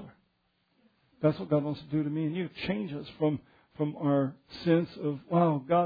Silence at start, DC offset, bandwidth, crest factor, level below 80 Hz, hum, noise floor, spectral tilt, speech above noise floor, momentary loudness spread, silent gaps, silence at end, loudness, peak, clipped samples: 0 s; under 0.1%; 5 kHz; 18 dB; -66 dBFS; none; -74 dBFS; -10 dB/octave; 45 dB; 8 LU; none; 0 s; -30 LUFS; -12 dBFS; under 0.1%